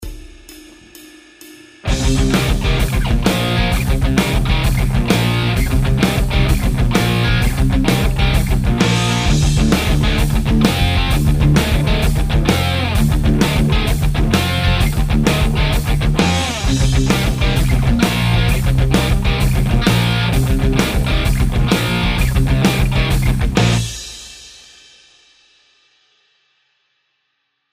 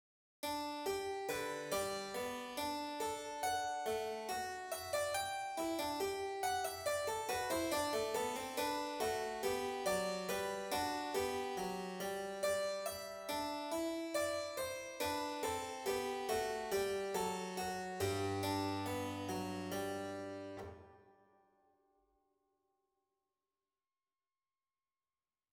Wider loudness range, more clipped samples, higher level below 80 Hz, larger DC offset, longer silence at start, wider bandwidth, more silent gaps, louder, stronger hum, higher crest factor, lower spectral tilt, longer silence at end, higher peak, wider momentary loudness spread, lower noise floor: about the same, 3 LU vs 4 LU; neither; first, -20 dBFS vs -70 dBFS; neither; second, 0 s vs 0.45 s; second, 16 kHz vs over 20 kHz; neither; first, -16 LUFS vs -40 LUFS; neither; about the same, 14 dB vs 16 dB; first, -5.5 dB/octave vs -3.5 dB/octave; second, 3.2 s vs 4.4 s; first, 0 dBFS vs -24 dBFS; second, 2 LU vs 5 LU; second, -69 dBFS vs under -90 dBFS